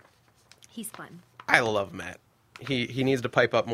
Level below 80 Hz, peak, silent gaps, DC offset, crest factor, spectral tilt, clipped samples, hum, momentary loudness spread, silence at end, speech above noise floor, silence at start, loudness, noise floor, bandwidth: -64 dBFS; 0 dBFS; none; under 0.1%; 28 dB; -4.5 dB/octave; under 0.1%; none; 21 LU; 0 s; 34 dB; 0.75 s; -26 LUFS; -61 dBFS; 16 kHz